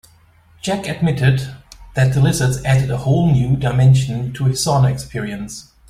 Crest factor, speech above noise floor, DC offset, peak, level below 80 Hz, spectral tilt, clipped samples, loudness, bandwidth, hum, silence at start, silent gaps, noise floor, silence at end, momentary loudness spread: 14 dB; 34 dB; under 0.1%; -2 dBFS; -40 dBFS; -6 dB/octave; under 0.1%; -17 LUFS; 14 kHz; none; 0.65 s; none; -50 dBFS; 0.3 s; 12 LU